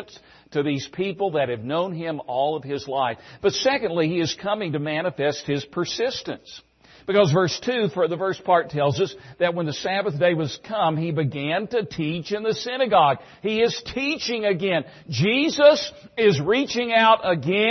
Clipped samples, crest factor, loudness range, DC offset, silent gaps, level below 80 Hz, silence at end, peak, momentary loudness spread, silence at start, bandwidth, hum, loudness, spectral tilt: under 0.1%; 20 dB; 4 LU; under 0.1%; none; -60 dBFS; 0 s; -2 dBFS; 9 LU; 0 s; 6.4 kHz; none; -22 LUFS; -5 dB/octave